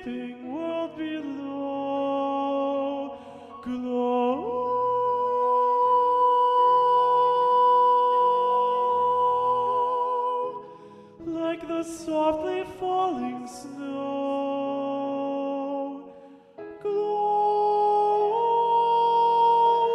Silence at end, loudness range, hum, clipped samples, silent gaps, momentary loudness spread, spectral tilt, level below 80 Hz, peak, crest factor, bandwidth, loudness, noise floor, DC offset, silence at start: 0 s; 9 LU; none; under 0.1%; none; 15 LU; -5.5 dB/octave; -66 dBFS; -12 dBFS; 12 dB; 11 kHz; -24 LUFS; -48 dBFS; under 0.1%; 0 s